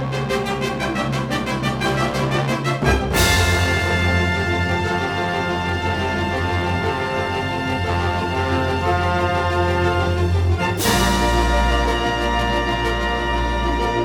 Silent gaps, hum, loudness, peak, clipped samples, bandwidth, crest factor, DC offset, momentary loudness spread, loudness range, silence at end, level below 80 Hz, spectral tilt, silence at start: none; none; -20 LUFS; -2 dBFS; under 0.1%; 19.5 kHz; 16 dB; under 0.1%; 5 LU; 3 LU; 0 s; -28 dBFS; -5 dB/octave; 0 s